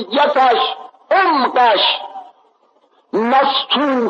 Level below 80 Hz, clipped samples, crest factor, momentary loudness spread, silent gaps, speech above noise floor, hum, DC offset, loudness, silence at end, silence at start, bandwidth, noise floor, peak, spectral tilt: -78 dBFS; under 0.1%; 12 dB; 10 LU; none; 42 dB; none; under 0.1%; -14 LUFS; 0 s; 0 s; 7.2 kHz; -56 dBFS; -4 dBFS; -4.5 dB/octave